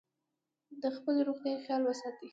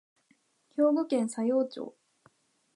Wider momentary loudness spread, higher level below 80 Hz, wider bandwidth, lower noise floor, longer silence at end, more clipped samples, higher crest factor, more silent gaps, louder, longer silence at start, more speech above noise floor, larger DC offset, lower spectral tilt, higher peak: second, 7 LU vs 15 LU; about the same, -86 dBFS vs -88 dBFS; second, 7.8 kHz vs 11.5 kHz; first, -87 dBFS vs -70 dBFS; second, 0 s vs 0.85 s; neither; about the same, 14 dB vs 16 dB; neither; second, -35 LUFS vs -29 LUFS; about the same, 0.7 s vs 0.75 s; first, 53 dB vs 42 dB; neither; about the same, -4.5 dB/octave vs -5.5 dB/octave; second, -22 dBFS vs -14 dBFS